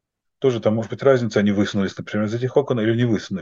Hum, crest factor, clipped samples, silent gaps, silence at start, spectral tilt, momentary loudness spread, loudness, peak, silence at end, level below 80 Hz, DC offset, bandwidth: none; 18 dB; under 0.1%; none; 0.4 s; -7 dB/octave; 6 LU; -21 LUFS; -2 dBFS; 0 s; -62 dBFS; under 0.1%; 7.6 kHz